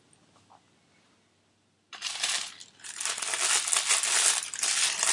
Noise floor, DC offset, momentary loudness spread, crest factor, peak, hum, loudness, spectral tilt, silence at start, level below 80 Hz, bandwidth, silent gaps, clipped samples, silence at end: -69 dBFS; under 0.1%; 15 LU; 28 dB; -4 dBFS; none; -25 LUFS; 3.5 dB/octave; 1.9 s; -90 dBFS; 11.5 kHz; none; under 0.1%; 0 s